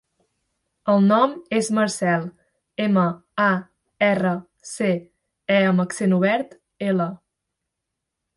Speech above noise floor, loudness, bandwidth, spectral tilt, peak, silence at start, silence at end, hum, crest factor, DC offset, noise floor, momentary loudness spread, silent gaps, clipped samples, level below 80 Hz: 61 dB; -21 LUFS; 11.5 kHz; -6 dB/octave; -4 dBFS; 0.85 s; 1.2 s; none; 18 dB; under 0.1%; -81 dBFS; 12 LU; none; under 0.1%; -66 dBFS